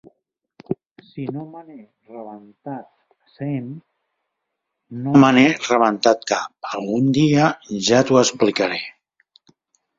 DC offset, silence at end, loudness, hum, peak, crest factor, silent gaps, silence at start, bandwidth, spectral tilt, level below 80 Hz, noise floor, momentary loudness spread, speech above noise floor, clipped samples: under 0.1%; 1.1 s; -18 LUFS; none; -2 dBFS; 20 dB; 0.91-0.96 s; 0.7 s; 7.8 kHz; -5 dB/octave; -62 dBFS; -79 dBFS; 23 LU; 60 dB; under 0.1%